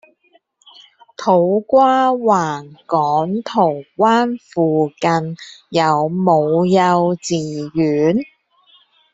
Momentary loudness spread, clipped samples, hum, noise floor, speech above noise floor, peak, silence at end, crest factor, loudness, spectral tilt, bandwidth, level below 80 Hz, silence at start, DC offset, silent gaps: 9 LU; under 0.1%; none; -57 dBFS; 42 dB; -2 dBFS; 0.9 s; 16 dB; -16 LUFS; -6.5 dB/octave; 8 kHz; -60 dBFS; 1.2 s; under 0.1%; none